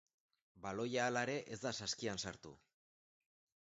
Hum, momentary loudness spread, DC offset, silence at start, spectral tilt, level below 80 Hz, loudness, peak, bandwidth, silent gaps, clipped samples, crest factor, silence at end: none; 13 LU; under 0.1%; 0.55 s; -3 dB/octave; -74 dBFS; -41 LUFS; -22 dBFS; 8 kHz; none; under 0.1%; 22 dB; 1.15 s